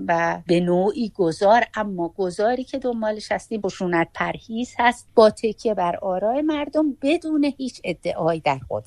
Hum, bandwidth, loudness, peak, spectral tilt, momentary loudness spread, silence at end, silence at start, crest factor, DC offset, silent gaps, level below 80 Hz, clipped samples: none; 11.5 kHz; -22 LUFS; -2 dBFS; -6 dB/octave; 9 LU; 0.05 s; 0 s; 20 dB; under 0.1%; none; -54 dBFS; under 0.1%